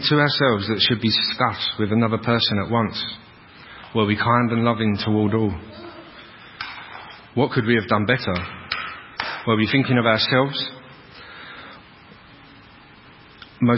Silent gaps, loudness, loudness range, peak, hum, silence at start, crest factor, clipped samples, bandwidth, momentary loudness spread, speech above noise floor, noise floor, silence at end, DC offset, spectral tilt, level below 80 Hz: none; -20 LUFS; 4 LU; -2 dBFS; none; 0 s; 20 dB; under 0.1%; 5.8 kHz; 21 LU; 27 dB; -47 dBFS; 0 s; under 0.1%; -10 dB/octave; -48 dBFS